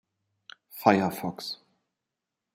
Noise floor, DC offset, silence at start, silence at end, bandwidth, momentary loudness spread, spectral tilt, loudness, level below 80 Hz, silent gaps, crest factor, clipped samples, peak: -86 dBFS; under 0.1%; 0.75 s; 1 s; 16 kHz; 18 LU; -5.5 dB/octave; -27 LUFS; -74 dBFS; none; 26 dB; under 0.1%; -4 dBFS